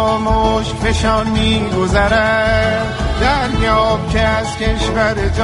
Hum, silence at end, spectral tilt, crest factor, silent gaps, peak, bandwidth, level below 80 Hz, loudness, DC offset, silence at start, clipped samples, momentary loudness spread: none; 0 s; -5.5 dB/octave; 14 dB; none; 0 dBFS; 11.5 kHz; -22 dBFS; -15 LUFS; under 0.1%; 0 s; under 0.1%; 4 LU